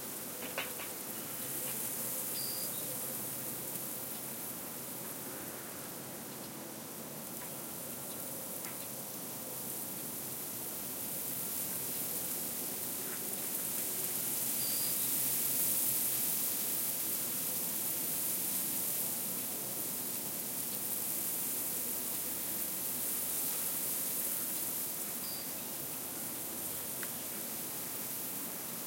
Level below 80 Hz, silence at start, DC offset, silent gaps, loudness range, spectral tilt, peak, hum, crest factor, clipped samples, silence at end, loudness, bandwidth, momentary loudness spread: -76 dBFS; 0 s; under 0.1%; none; 10 LU; -1.5 dB/octave; -18 dBFS; none; 20 dB; under 0.1%; 0 s; -35 LUFS; 16.5 kHz; 10 LU